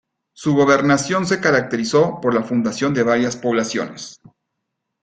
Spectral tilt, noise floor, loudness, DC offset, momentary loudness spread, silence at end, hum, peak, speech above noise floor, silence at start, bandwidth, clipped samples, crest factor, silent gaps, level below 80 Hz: -5 dB/octave; -77 dBFS; -18 LUFS; under 0.1%; 10 LU; 0.9 s; none; -2 dBFS; 60 dB; 0.4 s; 9.4 kHz; under 0.1%; 18 dB; none; -58 dBFS